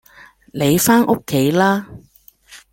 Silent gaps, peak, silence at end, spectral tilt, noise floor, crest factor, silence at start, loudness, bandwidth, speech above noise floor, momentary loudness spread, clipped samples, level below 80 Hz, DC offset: none; -2 dBFS; 0.15 s; -5 dB/octave; -47 dBFS; 16 dB; 0.55 s; -16 LUFS; 17 kHz; 31 dB; 9 LU; under 0.1%; -50 dBFS; under 0.1%